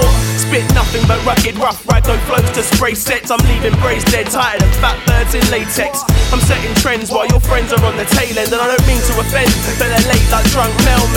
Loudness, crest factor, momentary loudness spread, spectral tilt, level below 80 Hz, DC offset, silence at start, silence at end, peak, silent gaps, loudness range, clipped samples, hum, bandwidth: -13 LUFS; 12 dB; 3 LU; -4.5 dB/octave; -18 dBFS; under 0.1%; 0 s; 0 s; 0 dBFS; none; 1 LU; under 0.1%; none; 19.5 kHz